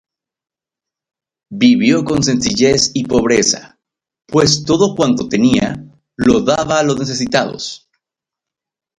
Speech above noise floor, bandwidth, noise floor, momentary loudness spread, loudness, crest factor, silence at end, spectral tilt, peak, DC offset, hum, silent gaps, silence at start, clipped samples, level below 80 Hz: 75 dB; 11 kHz; -88 dBFS; 10 LU; -14 LUFS; 16 dB; 1.25 s; -4 dB/octave; 0 dBFS; under 0.1%; none; none; 1.5 s; under 0.1%; -44 dBFS